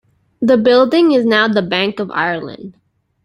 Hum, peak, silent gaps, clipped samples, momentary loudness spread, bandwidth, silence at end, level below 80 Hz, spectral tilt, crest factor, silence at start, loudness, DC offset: none; -2 dBFS; none; under 0.1%; 12 LU; 11.5 kHz; 0.55 s; -58 dBFS; -6.5 dB/octave; 14 dB; 0.4 s; -14 LUFS; under 0.1%